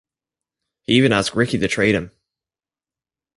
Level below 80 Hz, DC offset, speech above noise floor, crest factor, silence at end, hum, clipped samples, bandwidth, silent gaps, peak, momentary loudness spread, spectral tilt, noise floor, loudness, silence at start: -50 dBFS; under 0.1%; over 72 dB; 20 dB; 1.3 s; none; under 0.1%; 11.5 kHz; none; -2 dBFS; 14 LU; -5 dB/octave; under -90 dBFS; -18 LUFS; 0.9 s